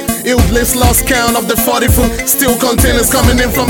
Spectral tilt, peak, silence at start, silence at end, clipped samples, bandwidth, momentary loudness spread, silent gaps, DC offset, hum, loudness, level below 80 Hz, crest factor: -4 dB/octave; 0 dBFS; 0 s; 0 s; under 0.1%; 19.5 kHz; 2 LU; none; under 0.1%; none; -10 LUFS; -18 dBFS; 10 dB